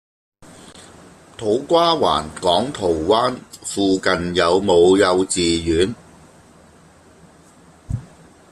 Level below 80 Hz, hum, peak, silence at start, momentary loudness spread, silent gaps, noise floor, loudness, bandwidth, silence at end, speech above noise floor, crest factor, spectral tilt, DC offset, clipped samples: -46 dBFS; none; -2 dBFS; 0.65 s; 16 LU; none; -48 dBFS; -18 LUFS; 13 kHz; 0.45 s; 31 dB; 18 dB; -4.5 dB/octave; under 0.1%; under 0.1%